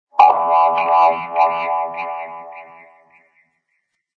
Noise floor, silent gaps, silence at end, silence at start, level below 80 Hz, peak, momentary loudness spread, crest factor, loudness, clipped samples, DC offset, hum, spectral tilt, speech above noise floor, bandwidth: -71 dBFS; none; 1.55 s; 0.15 s; -74 dBFS; 0 dBFS; 20 LU; 18 dB; -16 LUFS; under 0.1%; under 0.1%; none; -4.5 dB/octave; 50 dB; 6.4 kHz